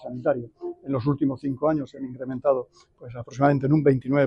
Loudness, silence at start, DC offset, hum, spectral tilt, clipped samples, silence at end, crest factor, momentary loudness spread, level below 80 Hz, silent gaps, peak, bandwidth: -24 LUFS; 0 s; under 0.1%; none; -9.5 dB/octave; under 0.1%; 0 s; 16 dB; 17 LU; -58 dBFS; none; -8 dBFS; 7.2 kHz